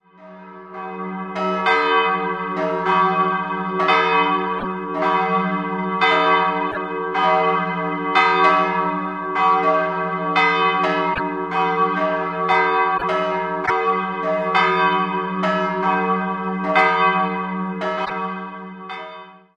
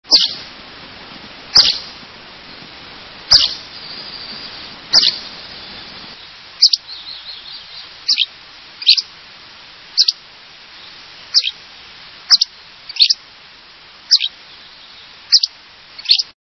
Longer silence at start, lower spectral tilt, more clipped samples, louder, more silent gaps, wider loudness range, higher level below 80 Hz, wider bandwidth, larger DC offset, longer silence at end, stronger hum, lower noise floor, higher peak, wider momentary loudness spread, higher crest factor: about the same, 0.2 s vs 0.1 s; first, -6 dB/octave vs 1 dB/octave; neither; second, -19 LUFS vs -13 LUFS; neither; about the same, 2 LU vs 3 LU; about the same, -56 dBFS vs -52 dBFS; second, 8.8 kHz vs 11 kHz; neither; about the same, 0.2 s vs 0.2 s; neither; about the same, -41 dBFS vs -41 dBFS; about the same, -2 dBFS vs 0 dBFS; second, 11 LU vs 24 LU; about the same, 18 dB vs 20 dB